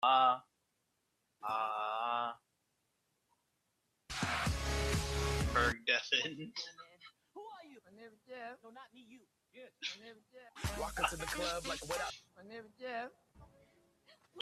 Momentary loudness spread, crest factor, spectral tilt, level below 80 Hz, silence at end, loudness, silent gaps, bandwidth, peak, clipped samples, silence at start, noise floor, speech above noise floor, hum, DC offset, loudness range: 24 LU; 22 dB; -3.5 dB/octave; -50 dBFS; 0 s; -37 LUFS; none; 14.5 kHz; -18 dBFS; under 0.1%; 0 s; -82 dBFS; 39 dB; none; under 0.1%; 15 LU